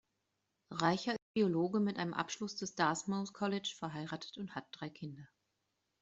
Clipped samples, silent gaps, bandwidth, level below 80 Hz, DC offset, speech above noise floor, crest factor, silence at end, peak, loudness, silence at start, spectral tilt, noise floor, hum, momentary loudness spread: under 0.1%; 1.22-1.34 s; 8 kHz; -78 dBFS; under 0.1%; 47 dB; 22 dB; 0.75 s; -16 dBFS; -37 LUFS; 0.7 s; -5 dB/octave; -85 dBFS; none; 12 LU